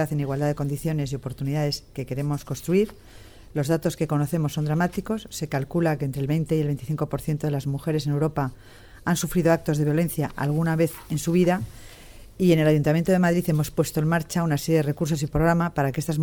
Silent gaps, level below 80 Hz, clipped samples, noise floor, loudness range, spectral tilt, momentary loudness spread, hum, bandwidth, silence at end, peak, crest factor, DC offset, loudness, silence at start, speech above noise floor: none; -46 dBFS; under 0.1%; -45 dBFS; 4 LU; -6.5 dB/octave; 8 LU; none; 19.5 kHz; 0 s; -6 dBFS; 16 dB; under 0.1%; -24 LUFS; 0 s; 21 dB